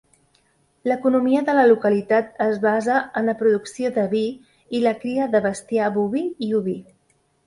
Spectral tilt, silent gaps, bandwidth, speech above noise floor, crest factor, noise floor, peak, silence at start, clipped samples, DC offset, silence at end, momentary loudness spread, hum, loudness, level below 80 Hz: -6 dB/octave; none; 11.5 kHz; 44 dB; 16 dB; -64 dBFS; -4 dBFS; 0.85 s; under 0.1%; under 0.1%; 0.65 s; 8 LU; none; -21 LUFS; -64 dBFS